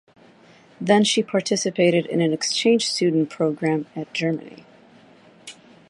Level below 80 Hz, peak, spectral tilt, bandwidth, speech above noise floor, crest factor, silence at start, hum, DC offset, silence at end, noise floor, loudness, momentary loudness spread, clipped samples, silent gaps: -70 dBFS; -4 dBFS; -4.5 dB/octave; 11.5 kHz; 30 dB; 20 dB; 0.8 s; none; under 0.1%; 0.35 s; -51 dBFS; -21 LUFS; 12 LU; under 0.1%; none